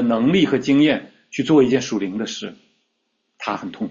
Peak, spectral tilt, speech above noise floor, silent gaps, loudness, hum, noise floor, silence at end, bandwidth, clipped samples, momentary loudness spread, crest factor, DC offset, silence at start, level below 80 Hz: -4 dBFS; -5.5 dB/octave; 53 dB; none; -19 LUFS; none; -72 dBFS; 0 s; 7.6 kHz; under 0.1%; 15 LU; 16 dB; under 0.1%; 0 s; -58 dBFS